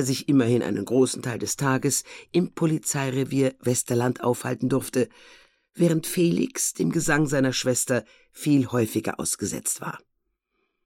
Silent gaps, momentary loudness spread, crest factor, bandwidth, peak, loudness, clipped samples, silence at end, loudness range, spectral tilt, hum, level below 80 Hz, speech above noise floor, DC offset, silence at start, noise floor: none; 5 LU; 18 dB; 17 kHz; -8 dBFS; -24 LUFS; under 0.1%; 0.9 s; 2 LU; -5 dB/octave; none; -56 dBFS; 52 dB; under 0.1%; 0 s; -76 dBFS